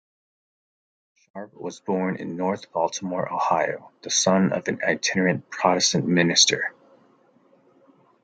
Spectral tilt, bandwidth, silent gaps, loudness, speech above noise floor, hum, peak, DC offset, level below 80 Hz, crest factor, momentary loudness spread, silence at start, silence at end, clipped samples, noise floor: -3 dB/octave; 10 kHz; none; -22 LUFS; 36 dB; none; -4 dBFS; under 0.1%; -70 dBFS; 22 dB; 16 LU; 1.35 s; 1.5 s; under 0.1%; -59 dBFS